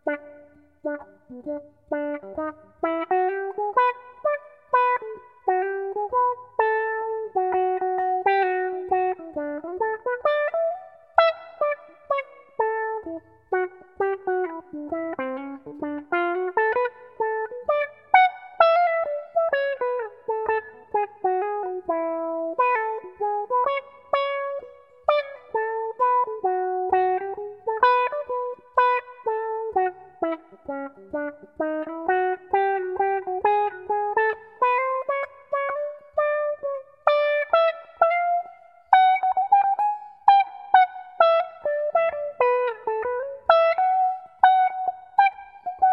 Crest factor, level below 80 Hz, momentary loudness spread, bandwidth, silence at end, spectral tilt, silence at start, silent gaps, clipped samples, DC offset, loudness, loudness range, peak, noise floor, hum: 24 dB; -68 dBFS; 12 LU; 5.6 kHz; 0 s; -6 dB/octave; 0.05 s; none; under 0.1%; under 0.1%; -24 LUFS; 6 LU; 0 dBFS; -52 dBFS; none